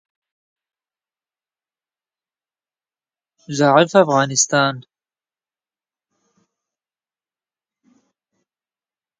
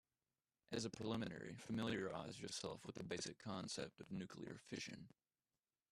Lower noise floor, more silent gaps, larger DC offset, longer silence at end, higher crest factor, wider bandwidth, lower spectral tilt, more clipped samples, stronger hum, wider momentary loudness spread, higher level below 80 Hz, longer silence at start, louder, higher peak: about the same, under -90 dBFS vs under -90 dBFS; neither; neither; first, 4.4 s vs 0.85 s; about the same, 24 dB vs 20 dB; second, 9.6 kHz vs 13.5 kHz; about the same, -3.5 dB/octave vs -4.5 dB/octave; neither; neither; first, 12 LU vs 8 LU; first, -70 dBFS vs -78 dBFS; first, 3.5 s vs 0.7 s; first, -15 LUFS vs -49 LUFS; first, 0 dBFS vs -30 dBFS